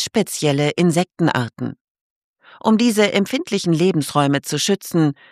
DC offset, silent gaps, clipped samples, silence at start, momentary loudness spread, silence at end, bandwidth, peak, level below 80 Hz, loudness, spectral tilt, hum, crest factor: under 0.1%; 1.81-1.95 s, 2.01-2.34 s; under 0.1%; 0 s; 6 LU; 0.2 s; 15.5 kHz; -2 dBFS; -62 dBFS; -18 LUFS; -5 dB/octave; none; 16 dB